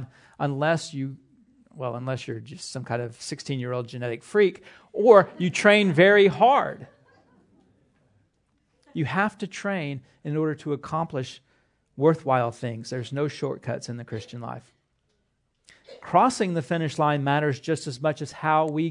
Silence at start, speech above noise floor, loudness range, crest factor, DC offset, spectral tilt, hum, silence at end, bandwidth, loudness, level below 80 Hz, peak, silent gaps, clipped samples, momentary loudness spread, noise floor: 0 s; 48 dB; 12 LU; 24 dB; under 0.1%; -6 dB/octave; none; 0 s; 11 kHz; -24 LUFS; -70 dBFS; -2 dBFS; none; under 0.1%; 18 LU; -72 dBFS